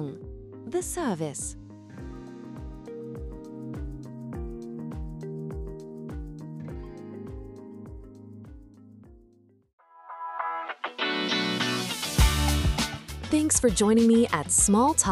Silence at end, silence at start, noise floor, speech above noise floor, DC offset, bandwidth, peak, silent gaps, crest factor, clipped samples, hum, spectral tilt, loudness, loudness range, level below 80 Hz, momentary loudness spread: 0 s; 0 s; -60 dBFS; 37 dB; under 0.1%; 15.5 kHz; -6 dBFS; 9.73-9.78 s; 22 dB; under 0.1%; none; -4 dB/octave; -26 LUFS; 19 LU; -38 dBFS; 23 LU